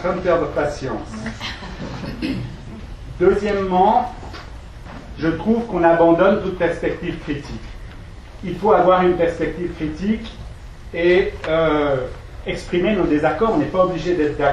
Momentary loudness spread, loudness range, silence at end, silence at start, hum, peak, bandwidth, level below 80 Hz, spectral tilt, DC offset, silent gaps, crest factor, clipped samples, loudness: 21 LU; 3 LU; 0 s; 0 s; none; -2 dBFS; 11 kHz; -36 dBFS; -7 dB/octave; under 0.1%; none; 18 dB; under 0.1%; -19 LUFS